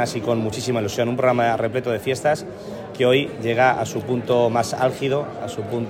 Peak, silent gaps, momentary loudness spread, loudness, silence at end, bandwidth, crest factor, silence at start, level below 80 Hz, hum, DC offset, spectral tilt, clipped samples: -4 dBFS; none; 8 LU; -21 LUFS; 0 s; 16 kHz; 16 dB; 0 s; -56 dBFS; none; under 0.1%; -5.5 dB/octave; under 0.1%